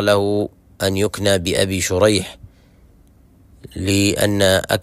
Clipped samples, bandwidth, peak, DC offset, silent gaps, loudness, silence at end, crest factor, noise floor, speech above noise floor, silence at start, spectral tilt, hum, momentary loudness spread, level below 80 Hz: under 0.1%; 16 kHz; -2 dBFS; under 0.1%; none; -18 LUFS; 0 s; 18 dB; -50 dBFS; 33 dB; 0 s; -4 dB/octave; none; 10 LU; -44 dBFS